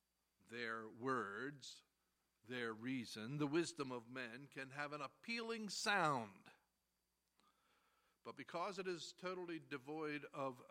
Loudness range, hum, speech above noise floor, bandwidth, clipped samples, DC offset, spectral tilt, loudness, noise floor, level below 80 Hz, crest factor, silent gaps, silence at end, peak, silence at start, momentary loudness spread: 7 LU; none; 42 dB; 16 kHz; under 0.1%; under 0.1%; -4 dB/octave; -46 LUFS; -88 dBFS; under -90 dBFS; 24 dB; none; 0.05 s; -24 dBFS; 0.5 s; 12 LU